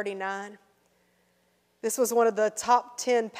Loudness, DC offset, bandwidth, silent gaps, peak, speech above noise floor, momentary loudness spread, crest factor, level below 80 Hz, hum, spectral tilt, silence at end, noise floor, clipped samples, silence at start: -27 LUFS; under 0.1%; 16 kHz; none; -8 dBFS; 43 dB; 12 LU; 20 dB; -76 dBFS; 60 Hz at -80 dBFS; -2.5 dB/octave; 0 s; -69 dBFS; under 0.1%; 0 s